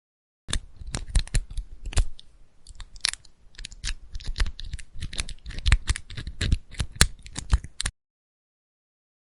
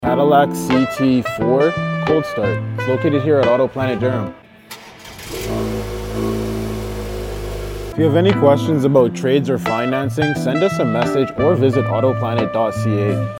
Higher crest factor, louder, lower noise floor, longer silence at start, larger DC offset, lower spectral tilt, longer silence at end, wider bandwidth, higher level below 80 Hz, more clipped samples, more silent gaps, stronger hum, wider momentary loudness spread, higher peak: first, 28 dB vs 16 dB; second, -30 LUFS vs -17 LUFS; first, -48 dBFS vs -38 dBFS; first, 0.5 s vs 0 s; neither; second, -2.5 dB/octave vs -7 dB/octave; first, 1.4 s vs 0 s; second, 12 kHz vs 17 kHz; first, -30 dBFS vs -36 dBFS; neither; neither; neither; first, 17 LU vs 13 LU; about the same, 0 dBFS vs 0 dBFS